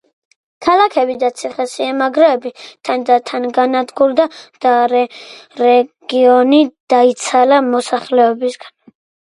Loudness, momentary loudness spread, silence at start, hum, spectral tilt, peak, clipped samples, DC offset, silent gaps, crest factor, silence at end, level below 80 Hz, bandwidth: -14 LUFS; 10 LU; 0.6 s; none; -3 dB/octave; 0 dBFS; under 0.1%; under 0.1%; 6.80-6.87 s; 14 dB; 0.55 s; -64 dBFS; 11.5 kHz